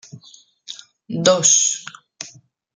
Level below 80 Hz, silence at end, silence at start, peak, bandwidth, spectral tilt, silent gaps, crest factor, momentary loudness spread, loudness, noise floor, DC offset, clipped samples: -72 dBFS; 0.45 s; 0.15 s; 0 dBFS; 10 kHz; -2 dB/octave; none; 22 dB; 24 LU; -15 LUFS; -49 dBFS; under 0.1%; under 0.1%